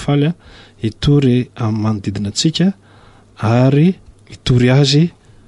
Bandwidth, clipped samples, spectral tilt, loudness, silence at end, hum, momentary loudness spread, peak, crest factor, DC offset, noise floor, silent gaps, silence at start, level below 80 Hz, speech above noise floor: 11 kHz; under 0.1%; -6.5 dB/octave; -15 LUFS; 0.4 s; none; 13 LU; -2 dBFS; 14 dB; under 0.1%; -44 dBFS; none; 0 s; -38 dBFS; 31 dB